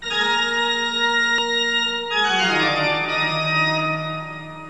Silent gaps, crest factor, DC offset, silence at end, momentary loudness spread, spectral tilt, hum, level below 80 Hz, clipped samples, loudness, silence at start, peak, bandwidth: none; 14 dB; 0.4%; 0 s; 5 LU; -3 dB/octave; none; -56 dBFS; under 0.1%; -19 LUFS; 0 s; -8 dBFS; 11 kHz